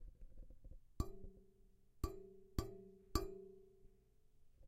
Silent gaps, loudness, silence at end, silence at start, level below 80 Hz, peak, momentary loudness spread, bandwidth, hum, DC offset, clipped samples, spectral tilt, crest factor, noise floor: none; -50 LUFS; 0 s; 0 s; -52 dBFS; -20 dBFS; 19 LU; 15.5 kHz; none; under 0.1%; under 0.1%; -6 dB/octave; 30 dB; -70 dBFS